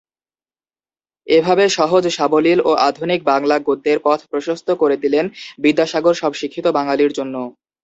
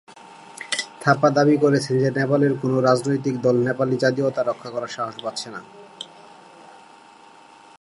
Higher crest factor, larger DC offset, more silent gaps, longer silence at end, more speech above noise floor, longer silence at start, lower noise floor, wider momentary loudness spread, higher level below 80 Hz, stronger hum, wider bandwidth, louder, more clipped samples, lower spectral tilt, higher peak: about the same, 16 dB vs 20 dB; neither; neither; second, 0.35 s vs 1.5 s; first, over 74 dB vs 28 dB; first, 1.25 s vs 0.1 s; first, under -90 dBFS vs -48 dBFS; second, 8 LU vs 21 LU; first, -60 dBFS vs -68 dBFS; neither; second, 8 kHz vs 11.5 kHz; first, -16 LUFS vs -21 LUFS; neither; second, -4.5 dB/octave vs -6 dB/octave; about the same, -2 dBFS vs -2 dBFS